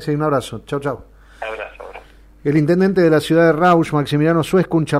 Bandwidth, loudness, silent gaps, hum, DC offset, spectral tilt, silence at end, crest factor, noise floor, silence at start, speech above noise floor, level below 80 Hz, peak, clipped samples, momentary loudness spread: 15 kHz; -16 LUFS; none; none; under 0.1%; -7 dB/octave; 0 s; 14 dB; -41 dBFS; 0 s; 25 dB; -46 dBFS; -4 dBFS; under 0.1%; 17 LU